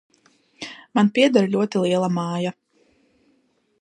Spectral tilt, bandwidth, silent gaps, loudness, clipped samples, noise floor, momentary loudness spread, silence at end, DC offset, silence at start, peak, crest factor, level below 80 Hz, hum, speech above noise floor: -6 dB/octave; 10 kHz; none; -20 LUFS; under 0.1%; -65 dBFS; 19 LU; 1.3 s; under 0.1%; 0.6 s; -2 dBFS; 20 dB; -70 dBFS; none; 45 dB